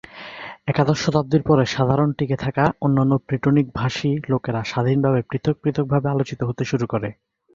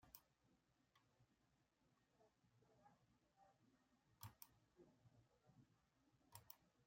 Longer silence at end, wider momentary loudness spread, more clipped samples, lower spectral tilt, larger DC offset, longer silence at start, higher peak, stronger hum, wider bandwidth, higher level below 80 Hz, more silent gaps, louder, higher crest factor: first, 0.4 s vs 0 s; about the same, 7 LU vs 5 LU; neither; first, -7 dB/octave vs -4 dB/octave; neither; first, 0.15 s vs 0 s; first, -2 dBFS vs -40 dBFS; neither; second, 7.4 kHz vs 16 kHz; first, -48 dBFS vs under -90 dBFS; neither; first, -21 LUFS vs -65 LUFS; second, 18 dB vs 34 dB